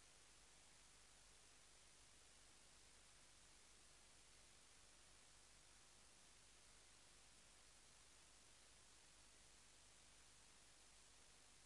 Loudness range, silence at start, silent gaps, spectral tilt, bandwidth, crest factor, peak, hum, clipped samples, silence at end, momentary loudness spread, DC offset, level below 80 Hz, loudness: 0 LU; 0 s; none; -1 dB/octave; 12 kHz; 14 dB; -56 dBFS; 50 Hz at -80 dBFS; under 0.1%; 0 s; 0 LU; under 0.1%; -80 dBFS; -68 LUFS